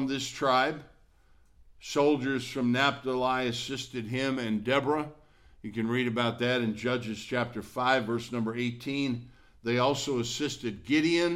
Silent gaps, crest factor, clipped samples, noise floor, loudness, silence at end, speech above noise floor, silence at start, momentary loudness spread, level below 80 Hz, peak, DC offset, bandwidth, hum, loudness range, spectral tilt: none; 18 dB; under 0.1%; -60 dBFS; -29 LUFS; 0 s; 31 dB; 0 s; 9 LU; -62 dBFS; -12 dBFS; under 0.1%; 15.5 kHz; none; 2 LU; -5 dB/octave